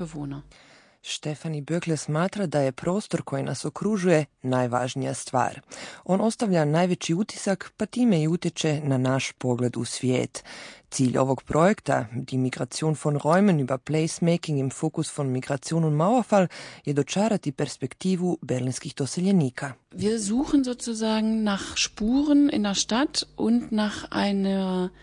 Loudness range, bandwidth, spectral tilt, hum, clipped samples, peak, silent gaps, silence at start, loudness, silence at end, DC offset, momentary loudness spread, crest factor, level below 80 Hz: 3 LU; 10.5 kHz; -5.5 dB/octave; none; under 0.1%; -6 dBFS; none; 0 s; -25 LUFS; 0.15 s; under 0.1%; 9 LU; 18 dB; -56 dBFS